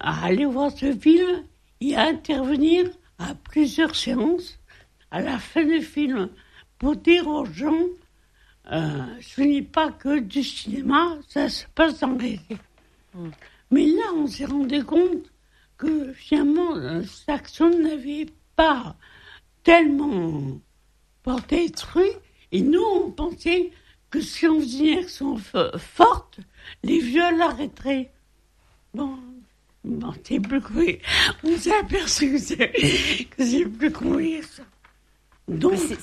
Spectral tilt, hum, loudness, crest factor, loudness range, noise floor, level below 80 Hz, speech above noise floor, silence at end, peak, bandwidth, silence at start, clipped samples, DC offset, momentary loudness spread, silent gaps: -4.5 dB/octave; none; -22 LUFS; 22 dB; 4 LU; -61 dBFS; -46 dBFS; 39 dB; 0 s; 0 dBFS; 13 kHz; 0 s; under 0.1%; under 0.1%; 13 LU; none